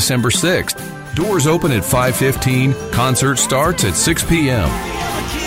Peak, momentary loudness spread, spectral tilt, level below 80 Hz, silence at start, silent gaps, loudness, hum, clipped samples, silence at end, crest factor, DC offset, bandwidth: -4 dBFS; 7 LU; -4 dB/octave; -32 dBFS; 0 s; none; -15 LUFS; none; under 0.1%; 0 s; 12 dB; under 0.1%; 16.5 kHz